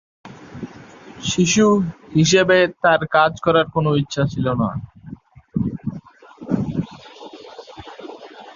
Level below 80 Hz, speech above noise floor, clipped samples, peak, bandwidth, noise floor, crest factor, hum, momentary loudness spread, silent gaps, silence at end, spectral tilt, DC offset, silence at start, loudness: -48 dBFS; 24 dB; under 0.1%; -2 dBFS; 7.6 kHz; -41 dBFS; 18 dB; none; 24 LU; none; 0.05 s; -5 dB/octave; under 0.1%; 0.25 s; -18 LUFS